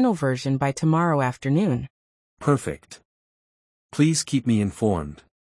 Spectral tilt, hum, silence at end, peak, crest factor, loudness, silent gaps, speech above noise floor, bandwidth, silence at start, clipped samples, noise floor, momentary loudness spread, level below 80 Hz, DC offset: -6 dB/octave; none; 0.3 s; -6 dBFS; 18 dB; -23 LUFS; 1.90-2.37 s, 3.05-3.89 s; over 68 dB; 12 kHz; 0 s; under 0.1%; under -90 dBFS; 13 LU; -54 dBFS; under 0.1%